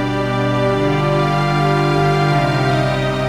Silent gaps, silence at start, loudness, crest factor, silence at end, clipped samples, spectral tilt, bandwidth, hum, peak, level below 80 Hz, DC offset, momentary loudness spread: none; 0 s; -16 LUFS; 14 dB; 0 s; under 0.1%; -7 dB/octave; 12.5 kHz; 50 Hz at -35 dBFS; -2 dBFS; -36 dBFS; under 0.1%; 3 LU